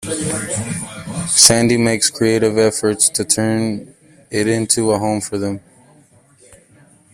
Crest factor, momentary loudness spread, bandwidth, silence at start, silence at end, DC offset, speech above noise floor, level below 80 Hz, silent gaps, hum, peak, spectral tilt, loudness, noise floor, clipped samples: 18 dB; 16 LU; 16 kHz; 0 s; 0.6 s; under 0.1%; 34 dB; -50 dBFS; none; none; 0 dBFS; -3 dB/octave; -15 LUFS; -50 dBFS; under 0.1%